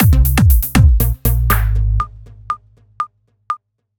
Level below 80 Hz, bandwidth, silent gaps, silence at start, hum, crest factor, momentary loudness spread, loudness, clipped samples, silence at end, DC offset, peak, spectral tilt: -16 dBFS; over 20 kHz; none; 0 s; none; 14 dB; 14 LU; -16 LUFS; under 0.1%; 0.4 s; under 0.1%; 0 dBFS; -6 dB/octave